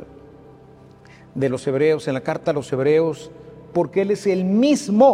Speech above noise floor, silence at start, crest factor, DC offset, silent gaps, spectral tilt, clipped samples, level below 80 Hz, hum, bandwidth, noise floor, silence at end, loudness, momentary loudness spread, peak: 28 dB; 0 s; 18 dB; under 0.1%; none; -6.5 dB/octave; under 0.1%; -58 dBFS; none; 12.5 kHz; -46 dBFS; 0 s; -20 LUFS; 8 LU; -4 dBFS